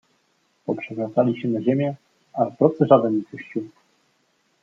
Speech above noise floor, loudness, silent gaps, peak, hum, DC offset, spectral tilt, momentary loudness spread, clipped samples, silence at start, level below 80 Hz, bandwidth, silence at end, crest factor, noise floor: 46 dB; -22 LUFS; none; -2 dBFS; none; under 0.1%; -9.5 dB/octave; 17 LU; under 0.1%; 0.7 s; -72 dBFS; 7.2 kHz; 0.95 s; 22 dB; -66 dBFS